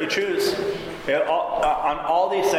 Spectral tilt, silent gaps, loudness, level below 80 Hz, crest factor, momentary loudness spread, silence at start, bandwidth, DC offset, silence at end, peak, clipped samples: -3.5 dB/octave; none; -23 LUFS; -48 dBFS; 12 dB; 5 LU; 0 s; 16 kHz; under 0.1%; 0 s; -10 dBFS; under 0.1%